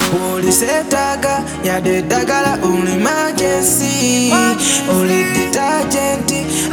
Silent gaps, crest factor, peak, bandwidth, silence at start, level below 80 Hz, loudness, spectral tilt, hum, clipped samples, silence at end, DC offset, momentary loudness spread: none; 14 dB; 0 dBFS; over 20 kHz; 0 s; -42 dBFS; -14 LUFS; -3.5 dB/octave; none; under 0.1%; 0 s; under 0.1%; 4 LU